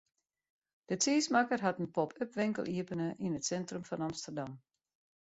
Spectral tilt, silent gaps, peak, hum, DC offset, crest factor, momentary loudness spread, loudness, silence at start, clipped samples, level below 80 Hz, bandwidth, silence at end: -4.5 dB/octave; none; -16 dBFS; none; under 0.1%; 22 dB; 11 LU; -35 LUFS; 0.9 s; under 0.1%; -74 dBFS; 8 kHz; 0.65 s